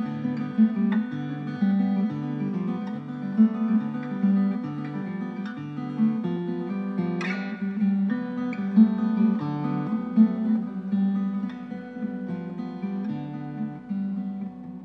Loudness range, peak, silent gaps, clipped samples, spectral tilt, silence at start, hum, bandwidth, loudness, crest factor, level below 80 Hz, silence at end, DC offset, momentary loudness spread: 6 LU; -8 dBFS; none; under 0.1%; -9.5 dB/octave; 0 s; none; 5.8 kHz; -26 LUFS; 18 dB; -70 dBFS; 0 s; under 0.1%; 12 LU